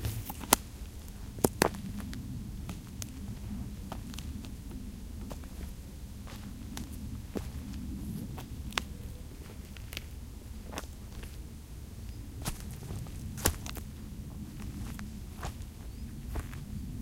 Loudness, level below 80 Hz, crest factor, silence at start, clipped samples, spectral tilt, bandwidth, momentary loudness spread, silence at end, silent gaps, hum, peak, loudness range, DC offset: -39 LUFS; -44 dBFS; 38 dB; 0 s; under 0.1%; -4 dB/octave; 17 kHz; 14 LU; 0 s; none; none; 0 dBFS; 7 LU; under 0.1%